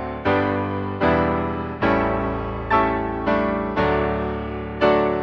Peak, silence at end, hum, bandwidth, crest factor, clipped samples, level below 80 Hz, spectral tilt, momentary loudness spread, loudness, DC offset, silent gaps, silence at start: -4 dBFS; 0 s; none; 7 kHz; 16 dB; under 0.1%; -36 dBFS; -8.5 dB/octave; 7 LU; -22 LUFS; under 0.1%; none; 0 s